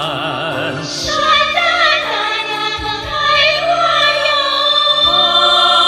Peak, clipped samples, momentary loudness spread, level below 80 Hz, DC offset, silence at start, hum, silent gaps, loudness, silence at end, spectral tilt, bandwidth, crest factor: -2 dBFS; under 0.1%; 10 LU; -42 dBFS; under 0.1%; 0 s; none; none; -12 LUFS; 0 s; -2 dB/octave; 15 kHz; 12 dB